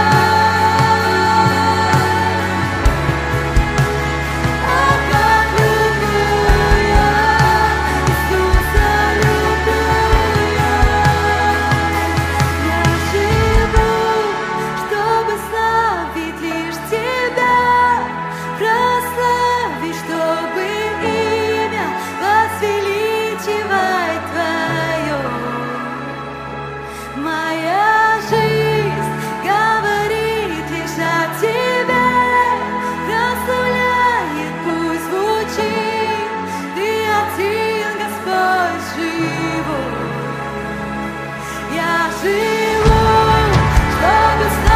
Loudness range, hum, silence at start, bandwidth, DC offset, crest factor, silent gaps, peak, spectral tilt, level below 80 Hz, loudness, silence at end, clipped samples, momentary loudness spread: 5 LU; none; 0 s; 16 kHz; under 0.1%; 14 dB; none; 0 dBFS; -5 dB/octave; -26 dBFS; -16 LUFS; 0 s; under 0.1%; 9 LU